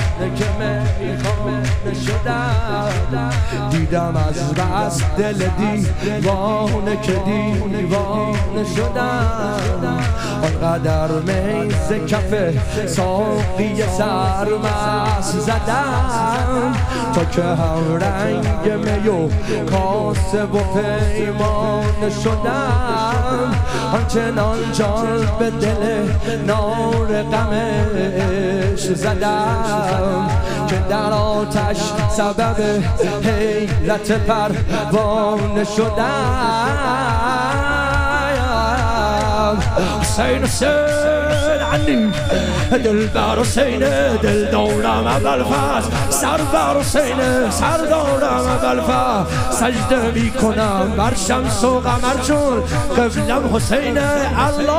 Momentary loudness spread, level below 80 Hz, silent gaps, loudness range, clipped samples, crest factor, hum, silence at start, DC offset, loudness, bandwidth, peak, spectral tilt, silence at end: 3 LU; -28 dBFS; none; 3 LU; under 0.1%; 14 dB; none; 0 s; under 0.1%; -18 LUFS; 15.5 kHz; -2 dBFS; -5.5 dB/octave; 0 s